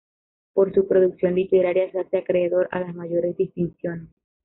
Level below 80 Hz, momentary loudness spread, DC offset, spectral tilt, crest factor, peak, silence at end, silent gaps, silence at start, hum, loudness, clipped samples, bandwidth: -60 dBFS; 9 LU; under 0.1%; -7.5 dB/octave; 16 dB; -8 dBFS; 0.4 s; none; 0.55 s; none; -22 LUFS; under 0.1%; 4 kHz